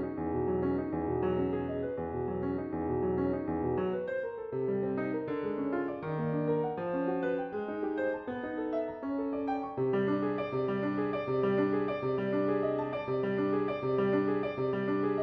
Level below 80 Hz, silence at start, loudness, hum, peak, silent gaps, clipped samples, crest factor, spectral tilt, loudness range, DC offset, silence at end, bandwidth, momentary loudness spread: -58 dBFS; 0 s; -32 LUFS; none; -18 dBFS; none; under 0.1%; 14 dB; -10 dB/octave; 3 LU; under 0.1%; 0 s; 5.2 kHz; 5 LU